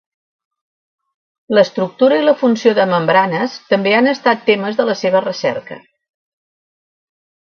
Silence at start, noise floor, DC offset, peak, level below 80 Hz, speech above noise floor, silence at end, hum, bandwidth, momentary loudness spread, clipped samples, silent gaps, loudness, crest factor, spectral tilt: 1.5 s; under -90 dBFS; under 0.1%; 0 dBFS; -66 dBFS; over 76 dB; 1.65 s; none; 7 kHz; 7 LU; under 0.1%; none; -14 LUFS; 16 dB; -5.5 dB/octave